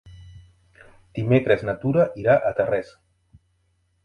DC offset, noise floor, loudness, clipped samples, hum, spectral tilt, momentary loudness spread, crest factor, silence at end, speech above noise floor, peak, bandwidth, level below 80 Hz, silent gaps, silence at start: under 0.1%; -67 dBFS; -21 LUFS; under 0.1%; none; -9 dB/octave; 11 LU; 20 dB; 1.2 s; 47 dB; -4 dBFS; 9.6 kHz; -52 dBFS; none; 0.05 s